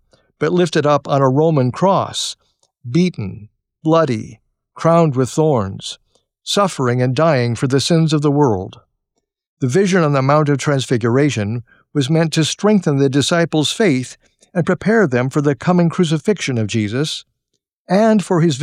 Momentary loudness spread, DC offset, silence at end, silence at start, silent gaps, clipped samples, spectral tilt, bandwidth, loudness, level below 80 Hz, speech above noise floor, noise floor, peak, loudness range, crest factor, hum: 10 LU; under 0.1%; 0 s; 0.4 s; 9.47-9.57 s, 17.73-17.85 s; under 0.1%; -6 dB/octave; 14 kHz; -16 LUFS; -56 dBFS; 58 dB; -73 dBFS; -4 dBFS; 2 LU; 12 dB; none